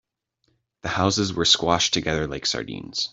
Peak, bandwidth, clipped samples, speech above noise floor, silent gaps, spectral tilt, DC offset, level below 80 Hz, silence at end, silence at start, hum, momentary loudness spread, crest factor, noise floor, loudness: -4 dBFS; 8.2 kHz; under 0.1%; 48 dB; none; -3 dB/octave; under 0.1%; -50 dBFS; 0.05 s; 0.85 s; none; 11 LU; 22 dB; -71 dBFS; -22 LUFS